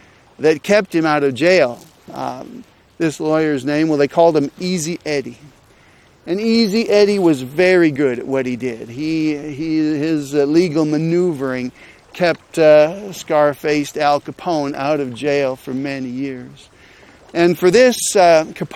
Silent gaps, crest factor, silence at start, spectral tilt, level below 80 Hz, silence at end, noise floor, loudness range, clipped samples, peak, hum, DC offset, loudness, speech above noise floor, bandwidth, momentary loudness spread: none; 16 dB; 0.4 s; -5 dB/octave; -56 dBFS; 0 s; -49 dBFS; 3 LU; under 0.1%; 0 dBFS; none; under 0.1%; -16 LUFS; 33 dB; 16 kHz; 13 LU